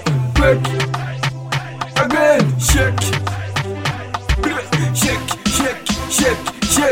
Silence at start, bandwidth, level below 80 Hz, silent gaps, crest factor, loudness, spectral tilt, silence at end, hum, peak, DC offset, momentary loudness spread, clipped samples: 0 s; 16.5 kHz; -28 dBFS; none; 16 dB; -17 LUFS; -4 dB/octave; 0 s; none; 0 dBFS; 0.2%; 8 LU; under 0.1%